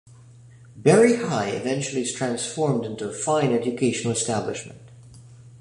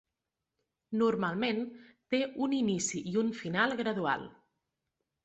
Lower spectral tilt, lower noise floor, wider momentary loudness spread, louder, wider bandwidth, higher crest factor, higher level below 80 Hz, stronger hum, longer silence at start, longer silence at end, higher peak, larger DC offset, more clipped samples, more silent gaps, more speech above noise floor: about the same, -5 dB/octave vs -4.5 dB/octave; second, -48 dBFS vs -88 dBFS; first, 11 LU vs 7 LU; first, -23 LUFS vs -32 LUFS; first, 11.5 kHz vs 8.2 kHz; about the same, 20 dB vs 20 dB; first, -60 dBFS vs -72 dBFS; neither; second, 0.55 s vs 0.9 s; second, 0.05 s vs 0.95 s; first, -4 dBFS vs -14 dBFS; neither; neither; neither; second, 25 dB vs 57 dB